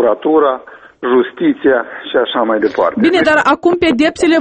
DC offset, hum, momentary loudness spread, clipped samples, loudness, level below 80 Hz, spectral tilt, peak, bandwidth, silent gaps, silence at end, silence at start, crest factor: under 0.1%; none; 6 LU; under 0.1%; -13 LUFS; -48 dBFS; -5 dB/octave; 0 dBFS; 8.8 kHz; none; 0 s; 0 s; 12 dB